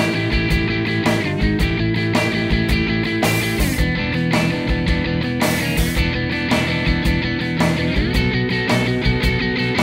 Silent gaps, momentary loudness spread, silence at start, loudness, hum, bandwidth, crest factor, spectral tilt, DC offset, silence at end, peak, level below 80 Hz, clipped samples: none; 2 LU; 0 s; -18 LUFS; none; 16.5 kHz; 14 dB; -5.5 dB/octave; under 0.1%; 0 s; -4 dBFS; -26 dBFS; under 0.1%